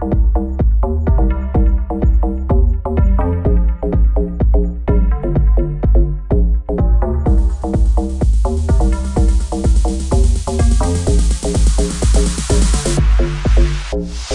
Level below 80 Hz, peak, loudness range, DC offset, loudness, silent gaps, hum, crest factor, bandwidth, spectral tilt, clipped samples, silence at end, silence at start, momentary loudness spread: -14 dBFS; -2 dBFS; 1 LU; 0.2%; -16 LUFS; none; none; 12 dB; 11.5 kHz; -6.5 dB/octave; under 0.1%; 0 s; 0 s; 2 LU